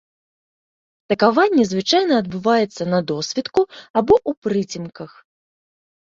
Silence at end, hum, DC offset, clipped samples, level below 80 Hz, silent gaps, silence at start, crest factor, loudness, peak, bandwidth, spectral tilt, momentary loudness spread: 0.95 s; none; under 0.1%; under 0.1%; -54 dBFS; 3.90-3.94 s, 4.37-4.42 s; 1.1 s; 18 dB; -19 LUFS; -2 dBFS; 7.8 kHz; -5 dB/octave; 12 LU